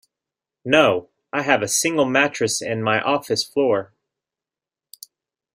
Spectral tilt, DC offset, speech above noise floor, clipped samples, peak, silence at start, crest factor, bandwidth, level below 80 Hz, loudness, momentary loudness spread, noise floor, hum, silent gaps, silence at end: -3 dB/octave; under 0.1%; 70 dB; under 0.1%; 0 dBFS; 0.65 s; 22 dB; 16 kHz; -62 dBFS; -20 LUFS; 9 LU; -89 dBFS; none; none; 1.7 s